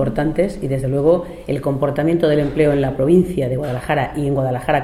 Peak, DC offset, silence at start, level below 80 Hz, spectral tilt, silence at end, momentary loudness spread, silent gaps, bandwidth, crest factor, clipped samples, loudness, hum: -2 dBFS; under 0.1%; 0 s; -38 dBFS; -8 dB/octave; 0 s; 6 LU; none; 14 kHz; 14 dB; under 0.1%; -18 LUFS; none